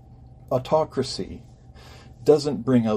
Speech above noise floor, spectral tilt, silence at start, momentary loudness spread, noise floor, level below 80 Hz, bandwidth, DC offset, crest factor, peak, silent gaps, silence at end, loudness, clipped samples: 25 dB; -6.5 dB/octave; 0.1 s; 13 LU; -46 dBFS; -52 dBFS; 14 kHz; under 0.1%; 20 dB; -4 dBFS; none; 0 s; -23 LUFS; under 0.1%